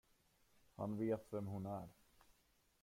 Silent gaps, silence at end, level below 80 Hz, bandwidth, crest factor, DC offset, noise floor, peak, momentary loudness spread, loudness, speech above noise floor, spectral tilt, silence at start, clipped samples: none; 0.9 s; -74 dBFS; 16.5 kHz; 18 dB; under 0.1%; -78 dBFS; -30 dBFS; 14 LU; -45 LUFS; 33 dB; -8.5 dB/octave; 0.8 s; under 0.1%